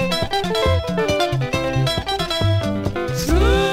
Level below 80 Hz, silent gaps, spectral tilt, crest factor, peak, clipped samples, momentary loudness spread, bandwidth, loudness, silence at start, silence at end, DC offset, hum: -28 dBFS; none; -5.5 dB/octave; 14 dB; -4 dBFS; under 0.1%; 5 LU; 16 kHz; -20 LUFS; 0 s; 0 s; under 0.1%; none